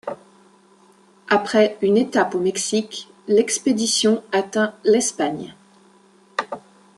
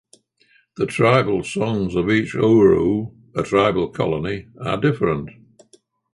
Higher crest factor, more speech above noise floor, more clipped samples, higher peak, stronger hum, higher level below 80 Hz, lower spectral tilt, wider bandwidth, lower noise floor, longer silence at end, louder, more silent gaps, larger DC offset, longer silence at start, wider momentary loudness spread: about the same, 18 dB vs 16 dB; second, 34 dB vs 41 dB; neither; about the same, -4 dBFS vs -2 dBFS; neither; second, -68 dBFS vs -46 dBFS; second, -3 dB/octave vs -7 dB/octave; about the same, 12.5 kHz vs 11.5 kHz; second, -53 dBFS vs -59 dBFS; second, 0.4 s vs 0.85 s; about the same, -20 LUFS vs -19 LUFS; neither; neither; second, 0.05 s vs 0.8 s; first, 16 LU vs 13 LU